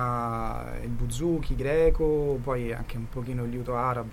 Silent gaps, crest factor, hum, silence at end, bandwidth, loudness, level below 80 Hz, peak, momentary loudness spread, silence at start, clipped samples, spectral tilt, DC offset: none; 16 dB; none; 0 s; 15.5 kHz; -29 LUFS; -34 dBFS; -10 dBFS; 11 LU; 0 s; under 0.1%; -7 dB/octave; under 0.1%